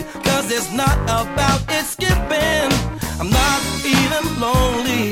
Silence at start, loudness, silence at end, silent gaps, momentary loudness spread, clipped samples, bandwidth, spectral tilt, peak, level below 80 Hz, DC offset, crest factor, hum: 0 s; -18 LUFS; 0 s; none; 4 LU; under 0.1%; 18 kHz; -4 dB/octave; -2 dBFS; -26 dBFS; under 0.1%; 16 dB; none